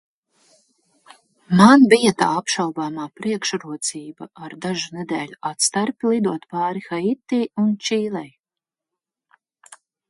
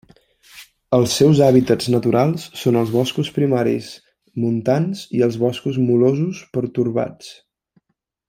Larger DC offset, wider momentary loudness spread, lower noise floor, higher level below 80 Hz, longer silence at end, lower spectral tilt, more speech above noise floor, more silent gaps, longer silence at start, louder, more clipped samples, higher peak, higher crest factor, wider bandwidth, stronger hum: neither; first, 16 LU vs 11 LU; first, -88 dBFS vs -71 dBFS; second, -64 dBFS vs -56 dBFS; first, 1.8 s vs 0.95 s; second, -4.5 dB/octave vs -6.5 dB/octave; first, 69 dB vs 54 dB; neither; first, 1.5 s vs 0.55 s; about the same, -19 LUFS vs -18 LUFS; neither; about the same, 0 dBFS vs -2 dBFS; about the same, 20 dB vs 18 dB; second, 11.5 kHz vs 16 kHz; neither